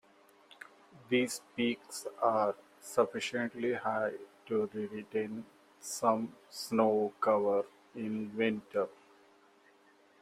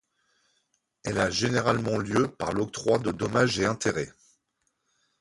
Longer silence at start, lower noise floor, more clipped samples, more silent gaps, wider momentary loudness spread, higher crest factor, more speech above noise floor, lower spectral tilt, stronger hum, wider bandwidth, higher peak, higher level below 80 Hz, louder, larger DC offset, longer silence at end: about the same, 0.95 s vs 1.05 s; second, -65 dBFS vs -76 dBFS; neither; neither; first, 14 LU vs 7 LU; about the same, 20 dB vs 22 dB; second, 31 dB vs 50 dB; about the same, -4.5 dB/octave vs -5 dB/octave; neither; first, 16 kHz vs 11.5 kHz; second, -14 dBFS vs -8 dBFS; second, -78 dBFS vs -54 dBFS; second, -34 LUFS vs -26 LUFS; neither; first, 1.3 s vs 1.1 s